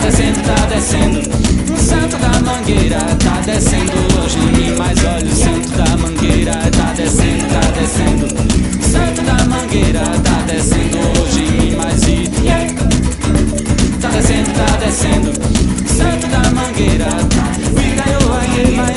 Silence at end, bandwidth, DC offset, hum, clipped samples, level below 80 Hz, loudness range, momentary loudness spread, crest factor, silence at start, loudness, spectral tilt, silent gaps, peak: 0 s; 11.5 kHz; under 0.1%; none; under 0.1%; -18 dBFS; 1 LU; 1 LU; 12 dB; 0 s; -13 LUFS; -5 dB/octave; none; 0 dBFS